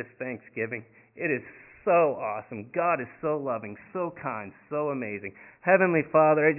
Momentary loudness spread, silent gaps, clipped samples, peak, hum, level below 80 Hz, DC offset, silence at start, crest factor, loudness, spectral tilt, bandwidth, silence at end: 15 LU; none; under 0.1%; -6 dBFS; none; -68 dBFS; under 0.1%; 0 s; 20 dB; -27 LUFS; -11.5 dB/octave; 3 kHz; 0 s